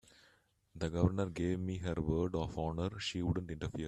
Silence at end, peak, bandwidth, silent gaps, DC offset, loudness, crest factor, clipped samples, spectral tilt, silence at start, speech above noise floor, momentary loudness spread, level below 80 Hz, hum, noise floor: 0 s; -16 dBFS; 11 kHz; none; under 0.1%; -37 LUFS; 20 dB; under 0.1%; -7 dB/octave; 0.75 s; 35 dB; 5 LU; -54 dBFS; none; -71 dBFS